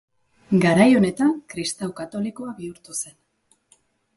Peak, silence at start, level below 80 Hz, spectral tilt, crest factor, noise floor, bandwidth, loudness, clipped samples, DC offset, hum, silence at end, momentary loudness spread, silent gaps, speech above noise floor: -4 dBFS; 0.5 s; -60 dBFS; -5.5 dB/octave; 20 dB; -65 dBFS; 11.5 kHz; -21 LUFS; under 0.1%; under 0.1%; none; 1.1 s; 18 LU; none; 45 dB